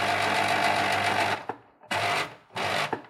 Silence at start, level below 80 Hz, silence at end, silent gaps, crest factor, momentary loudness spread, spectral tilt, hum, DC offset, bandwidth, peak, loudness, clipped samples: 0 s; -66 dBFS; 0.05 s; none; 16 dB; 10 LU; -3 dB/octave; none; under 0.1%; 16 kHz; -12 dBFS; -26 LUFS; under 0.1%